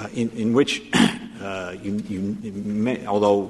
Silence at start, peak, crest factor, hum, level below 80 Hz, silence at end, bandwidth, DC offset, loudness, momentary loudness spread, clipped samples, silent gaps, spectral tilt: 0 s; -6 dBFS; 18 dB; none; -56 dBFS; 0 s; 12.5 kHz; under 0.1%; -23 LUFS; 11 LU; under 0.1%; none; -5 dB/octave